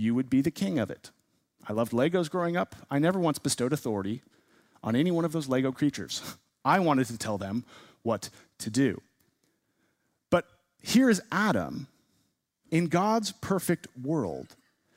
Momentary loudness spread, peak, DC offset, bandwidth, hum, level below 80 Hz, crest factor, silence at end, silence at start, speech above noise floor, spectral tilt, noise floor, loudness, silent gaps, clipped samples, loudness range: 12 LU; -8 dBFS; under 0.1%; 16 kHz; none; -66 dBFS; 20 dB; 0.5 s; 0 s; 47 dB; -5.5 dB/octave; -74 dBFS; -29 LUFS; none; under 0.1%; 3 LU